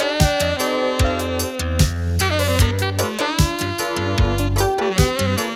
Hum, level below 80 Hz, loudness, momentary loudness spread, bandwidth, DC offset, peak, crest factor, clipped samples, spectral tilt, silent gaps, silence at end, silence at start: none; -26 dBFS; -19 LUFS; 4 LU; 16.5 kHz; under 0.1%; -2 dBFS; 18 dB; under 0.1%; -4.5 dB/octave; none; 0 s; 0 s